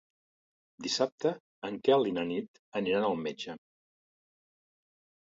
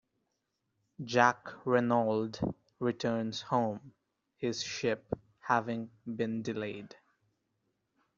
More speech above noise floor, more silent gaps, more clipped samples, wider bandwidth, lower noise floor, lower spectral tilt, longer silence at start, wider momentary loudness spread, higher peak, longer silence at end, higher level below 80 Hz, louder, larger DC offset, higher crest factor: first, over 59 dB vs 50 dB; first, 1.12-1.18 s, 1.40-1.62 s, 2.48-2.72 s vs none; neither; about the same, 7.8 kHz vs 7.6 kHz; first, under -90 dBFS vs -82 dBFS; about the same, -4.5 dB/octave vs -4 dB/octave; second, 0.8 s vs 1 s; about the same, 14 LU vs 13 LU; second, -12 dBFS vs -8 dBFS; first, 1.65 s vs 1.3 s; second, -74 dBFS vs -66 dBFS; about the same, -32 LUFS vs -33 LUFS; neither; about the same, 22 dB vs 26 dB